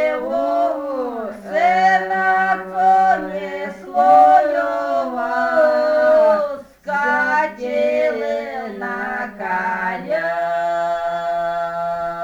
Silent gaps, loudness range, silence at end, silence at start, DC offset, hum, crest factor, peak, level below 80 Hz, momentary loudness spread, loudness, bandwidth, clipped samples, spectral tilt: none; 6 LU; 0 s; 0 s; under 0.1%; none; 16 dB; -2 dBFS; -56 dBFS; 11 LU; -18 LUFS; 9.4 kHz; under 0.1%; -5 dB/octave